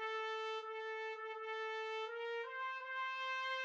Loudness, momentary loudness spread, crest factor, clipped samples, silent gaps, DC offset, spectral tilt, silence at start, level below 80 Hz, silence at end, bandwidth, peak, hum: -43 LUFS; 4 LU; 14 dB; under 0.1%; none; under 0.1%; 2.5 dB/octave; 0 s; under -90 dBFS; 0 s; 8 kHz; -30 dBFS; none